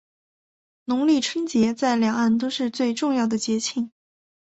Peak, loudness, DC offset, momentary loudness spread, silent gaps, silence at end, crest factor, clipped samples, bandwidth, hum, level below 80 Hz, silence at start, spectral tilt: -8 dBFS; -23 LUFS; under 0.1%; 7 LU; none; 0.55 s; 16 dB; under 0.1%; 8.2 kHz; none; -64 dBFS; 0.9 s; -4 dB/octave